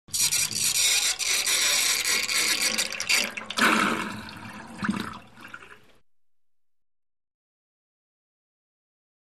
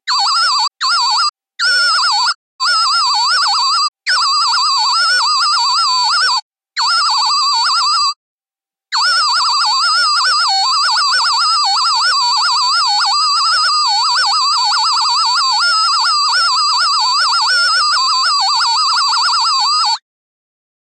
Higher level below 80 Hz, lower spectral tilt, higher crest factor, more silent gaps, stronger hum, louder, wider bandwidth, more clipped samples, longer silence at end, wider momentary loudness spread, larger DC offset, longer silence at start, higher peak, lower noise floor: first, -62 dBFS vs under -90 dBFS; first, 0 dB/octave vs 6.5 dB/octave; first, 20 dB vs 10 dB; second, none vs 1.29-1.33 s, 2.35-2.59 s, 3.88-3.92 s, 6.42-6.51 s, 8.16-8.38 s; neither; second, -22 LUFS vs -11 LUFS; first, 15.5 kHz vs 11.5 kHz; neither; first, 3.6 s vs 1 s; first, 19 LU vs 3 LU; first, 0.2% vs under 0.1%; about the same, 0.1 s vs 0.05 s; second, -8 dBFS vs -4 dBFS; second, -76 dBFS vs under -90 dBFS